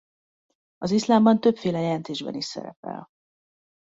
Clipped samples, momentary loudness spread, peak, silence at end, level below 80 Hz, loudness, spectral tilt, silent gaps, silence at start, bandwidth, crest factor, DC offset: under 0.1%; 19 LU; -6 dBFS; 0.95 s; -66 dBFS; -23 LUFS; -6 dB/octave; 2.76-2.83 s; 0.8 s; 7.8 kHz; 20 dB; under 0.1%